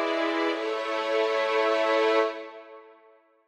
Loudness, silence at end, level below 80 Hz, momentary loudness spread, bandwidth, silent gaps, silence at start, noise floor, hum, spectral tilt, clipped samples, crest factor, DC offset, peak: -25 LUFS; 0.6 s; under -90 dBFS; 12 LU; 10 kHz; none; 0 s; -59 dBFS; none; -1.5 dB/octave; under 0.1%; 14 dB; under 0.1%; -12 dBFS